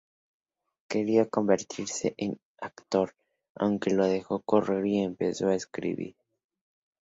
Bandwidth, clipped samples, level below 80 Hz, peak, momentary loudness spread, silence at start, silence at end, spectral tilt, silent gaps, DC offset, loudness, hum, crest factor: 7.8 kHz; under 0.1%; -66 dBFS; -8 dBFS; 10 LU; 0.9 s; 0.95 s; -5.5 dB/octave; 2.45-2.55 s, 3.50-3.55 s; under 0.1%; -28 LUFS; none; 20 dB